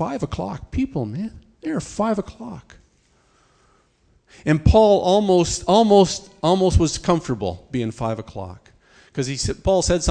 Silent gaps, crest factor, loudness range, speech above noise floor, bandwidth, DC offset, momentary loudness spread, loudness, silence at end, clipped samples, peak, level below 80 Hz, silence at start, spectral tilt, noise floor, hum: none; 20 dB; 11 LU; 41 dB; 10 kHz; under 0.1%; 19 LU; -20 LUFS; 0 s; under 0.1%; 0 dBFS; -34 dBFS; 0 s; -5.5 dB/octave; -60 dBFS; none